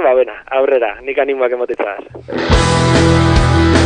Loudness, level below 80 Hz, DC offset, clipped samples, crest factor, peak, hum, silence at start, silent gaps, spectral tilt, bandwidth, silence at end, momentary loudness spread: -14 LUFS; -22 dBFS; under 0.1%; under 0.1%; 12 dB; 0 dBFS; none; 0 s; none; -6 dB/octave; 10 kHz; 0 s; 10 LU